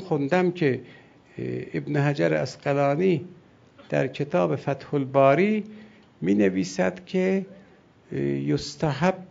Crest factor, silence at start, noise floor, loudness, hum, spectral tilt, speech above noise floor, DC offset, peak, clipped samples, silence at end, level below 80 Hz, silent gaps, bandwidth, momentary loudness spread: 20 dB; 0 s; -54 dBFS; -25 LUFS; none; -7 dB/octave; 30 dB; under 0.1%; -6 dBFS; under 0.1%; 0.05 s; -60 dBFS; none; 7.8 kHz; 11 LU